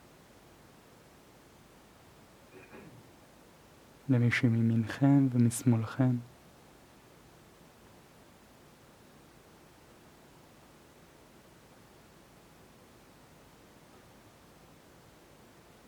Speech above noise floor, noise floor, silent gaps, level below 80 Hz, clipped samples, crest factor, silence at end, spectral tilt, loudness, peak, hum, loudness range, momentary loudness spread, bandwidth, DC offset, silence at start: 31 dB; -58 dBFS; none; -70 dBFS; under 0.1%; 24 dB; 9.65 s; -7 dB/octave; -28 LUFS; -12 dBFS; none; 10 LU; 28 LU; 16 kHz; under 0.1%; 2.55 s